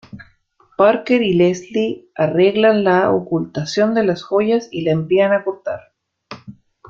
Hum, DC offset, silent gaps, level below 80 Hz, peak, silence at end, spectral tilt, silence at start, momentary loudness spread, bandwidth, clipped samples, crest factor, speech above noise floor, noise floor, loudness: none; under 0.1%; none; -58 dBFS; -2 dBFS; 0.4 s; -6.5 dB/octave; 0.15 s; 14 LU; 7.4 kHz; under 0.1%; 16 dB; 40 dB; -56 dBFS; -17 LUFS